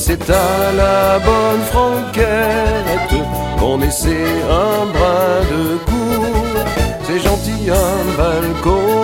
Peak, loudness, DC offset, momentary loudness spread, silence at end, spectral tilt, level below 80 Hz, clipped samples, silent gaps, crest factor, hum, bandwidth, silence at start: 0 dBFS; -15 LUFS; under 0.1%; 5 LU; 0 s; -5 dB/octave; -22 dBFS; under 0.1%; none; 14 dB; none; 16.5 kHz; 0 s